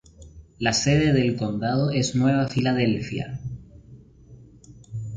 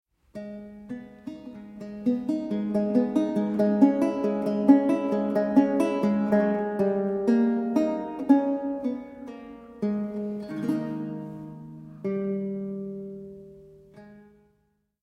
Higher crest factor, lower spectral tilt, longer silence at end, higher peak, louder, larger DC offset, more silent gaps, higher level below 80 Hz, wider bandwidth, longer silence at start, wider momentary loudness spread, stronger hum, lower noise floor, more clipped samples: about the same, 18 dB vs 22 dB; second, -5.5 dB/octave vs -8.5 dB/octave; second, 0 s vs 0.8 s; about the same, -6 dBFS vs -4 dBFS; about the same, -23 LUFS vs -25 LUFS; neither; neither; first, -48 dBFS vs -64 dBFS; second, 9.4 kHz vs 11 kHz; second, 0.2 s vs 0.35 s; second, 16 LU vs 20 LU; neither; second, -48 dBFS vs -71 dBFS; neither